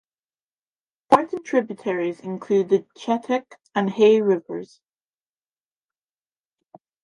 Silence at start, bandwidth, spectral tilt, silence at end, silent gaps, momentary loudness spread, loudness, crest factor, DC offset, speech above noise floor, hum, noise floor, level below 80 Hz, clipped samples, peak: 1.1 s; 11 kHz; -6.5 dB/octave; 2.4 s; none; 11 LU; -22 LUFS; 22 dB; under 0.1%; over 68 dB; none; under -90 dBFS; -72 dBFS; under 0.1%; -2 dBFS